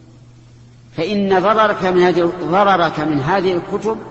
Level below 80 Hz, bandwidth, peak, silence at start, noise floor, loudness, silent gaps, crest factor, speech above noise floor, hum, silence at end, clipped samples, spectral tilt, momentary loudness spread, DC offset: -48 dBFS; 8 kHz; 0 dBFS; 0.95 s; -43 dBFS; -16 LUFS; none; 16 dB; 28 dB; none; 0 s; under 0.1%; -6.5 dB/octave; 8 LU; under 0.1%